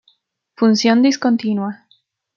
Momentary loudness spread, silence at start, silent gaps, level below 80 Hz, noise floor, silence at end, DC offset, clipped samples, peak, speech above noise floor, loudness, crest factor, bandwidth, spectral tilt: 9 LU; 0.6 s; none; -68 dBFS; -60 dBFS; 0.6 s; under 0.1%; under 0.1%; -2 dBFS; 45 dB; -16 LUFS; 16 dB; 7.4 kHz; -5 dB/octave